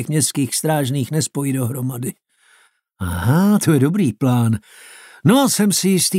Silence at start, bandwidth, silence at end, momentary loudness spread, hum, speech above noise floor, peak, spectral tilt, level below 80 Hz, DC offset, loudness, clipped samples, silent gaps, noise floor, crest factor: 0 s; 16 kHz; 0 s; 10 LU; none; 39 dB; -2 dBFS; -5 dB/octave; -48 dBFS; under 0.1%; -18 LUFS; under 0.1%; none; -56 dBFS; 16 dB